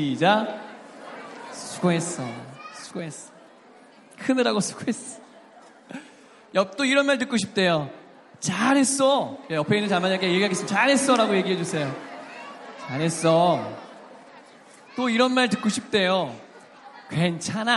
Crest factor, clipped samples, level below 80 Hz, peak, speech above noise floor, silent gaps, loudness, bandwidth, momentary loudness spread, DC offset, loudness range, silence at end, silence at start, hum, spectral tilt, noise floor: 20 dB; under 0.1%; -72 dBFS; -6 dBFS; 28 dB; none; -23 LUFS; 11.5 kHz; 20 LU; under 0.1%; 8 LU; 0 s; 0 s; none; -4 dB/octave; -51 dBFS